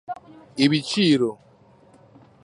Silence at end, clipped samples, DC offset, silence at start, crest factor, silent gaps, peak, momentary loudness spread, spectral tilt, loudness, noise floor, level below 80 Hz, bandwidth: 1.1 s; under 0.1%; under 0.1%; 0.1 s; 20 dB; none; -4 dBFS; 18 LU; -5.5 dB/octave; -21 LUFS; -54 dBFS; -66 dBFS; 11.5 kHz